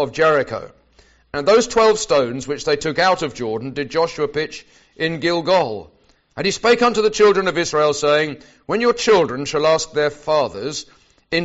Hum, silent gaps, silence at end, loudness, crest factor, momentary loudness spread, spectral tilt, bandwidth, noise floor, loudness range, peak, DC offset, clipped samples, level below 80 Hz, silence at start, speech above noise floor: none; none; 0 s; -18 LUFS; 16 dB; 12 LU; -2.5 dB/octave; 8 kHz; -54 dBFS; 4 LU; -2 dBFS; under 0.1%; under 0.1%; -50 dBFS; 0 s; 36 dB